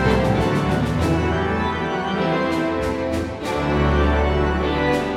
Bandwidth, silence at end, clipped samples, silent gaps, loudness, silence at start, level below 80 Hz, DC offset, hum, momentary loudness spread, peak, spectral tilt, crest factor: 14 kHz; 0 s; under 0.1%; none; -21 LUFS; 0 s; -30 dBFS; under 0.1%; none; 5 LU; -6 dBFS; -7 dB/octave; 14 dB